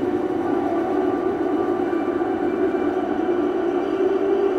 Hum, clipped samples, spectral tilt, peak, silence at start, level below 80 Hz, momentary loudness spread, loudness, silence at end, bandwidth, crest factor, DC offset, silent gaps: none; under 0.1%; -7.5 dB/octave; -8 dBFS; 0 s; -54 dBFS; 2 LU; -22 LUFS; 0 s; 7.6 kHz; 12 dB; under 0.1%; none